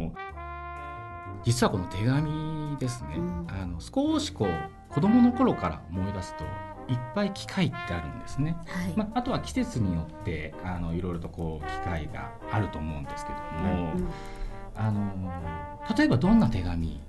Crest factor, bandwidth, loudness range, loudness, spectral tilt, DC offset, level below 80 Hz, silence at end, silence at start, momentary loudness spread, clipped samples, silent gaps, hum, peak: 20 dB; 12 kHz; 6 LU; -29 LUFS; -6.5 dB/octave; under 0.1%; -42 dBFS; 0 s; 0 s; 15 LU; under 0.1%; none; none; -10 dBFS